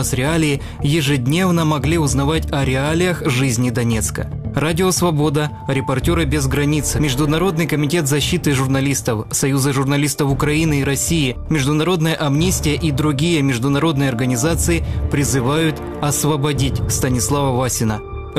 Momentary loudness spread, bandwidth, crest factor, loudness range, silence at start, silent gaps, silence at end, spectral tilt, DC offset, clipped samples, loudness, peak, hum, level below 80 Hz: 3 LU; 15.5 kHz; 14 dB; 1 LU; 0 s; none; 0 s; -5 dB/octave; 0.2%; under 0.1%; -17 LUFS; -4 dBFS; none; -30 dBFS